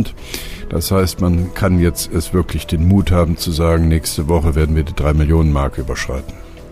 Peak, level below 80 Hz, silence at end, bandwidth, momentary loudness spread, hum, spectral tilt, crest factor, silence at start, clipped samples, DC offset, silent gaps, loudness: -4 dBFS; -22 dBFS; 0 s; 15.5 kHz; 10 LU; none; -6 dB/octave; 12 dB; 0 s; under 0.1%; under 0.1%; none; -16 LUFS